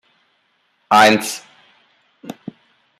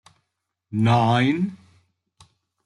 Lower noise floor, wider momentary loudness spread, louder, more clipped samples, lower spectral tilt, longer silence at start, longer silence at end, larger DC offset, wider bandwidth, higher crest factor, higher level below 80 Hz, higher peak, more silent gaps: second, -64 dBFS vs -79 dBFS; first, 25 LU vs 11 LU; first, -14 LUFS vs -21 LUFS; neither; second, -3 dB/octave vs -7.5 dB/octave; first, 0.9 s vs 0.7 s; second, 0.65 s vs 1.1 s; neither; first, 15.5 kHz vs 10 kHz; about the same, 20 dB vs 18 dB; about the same, -66 dBFS vs -62 dBFS; first, 0 dBFS vs -6 dBFS; neither